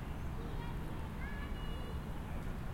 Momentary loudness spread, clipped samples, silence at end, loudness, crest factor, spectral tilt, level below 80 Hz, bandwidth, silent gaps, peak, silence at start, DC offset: 1 LU; under 0.1%; 0 s; -44 LUFS; 12 dB; -6.5 dB/octave; -44 dBFS; 16.5 kHz; none; -28 dBFS; 0 s; under 0.1%